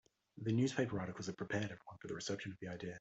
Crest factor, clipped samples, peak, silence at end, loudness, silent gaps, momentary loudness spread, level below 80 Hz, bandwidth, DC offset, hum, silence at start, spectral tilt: 20 dB; under 0.1%; -22 dBFS; 0 s; -41 LUFS; none; 11 LU; -74 dBFS; 8.2 kHz; under 0.1%; none; 0.35 s; -5.5 dB/octave